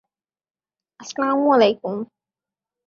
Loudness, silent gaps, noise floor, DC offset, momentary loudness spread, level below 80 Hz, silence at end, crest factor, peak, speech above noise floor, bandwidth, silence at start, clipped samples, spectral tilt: -19 LUFS; none; -90 dBFS; under 0.1%; 20 LU; -68 dBFS; 0.8 s; 20 dB; -2 dBFS; 71 dB; 7.6 kHz; 1 s; under 0.1%; -5 dB/octave